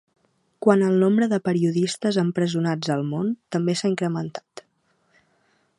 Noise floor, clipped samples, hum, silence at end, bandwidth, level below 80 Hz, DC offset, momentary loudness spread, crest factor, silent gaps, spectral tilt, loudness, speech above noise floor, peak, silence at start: -67 dBFS; under 0.1%; none; 1.2 s; 11.5 kHz; -70 dBFS; under 0.1%; 8 LU; 22 dB; none; -6.5 dB/octave; -22 LUFS; 45 dB; -2 dBFS; 0.6 s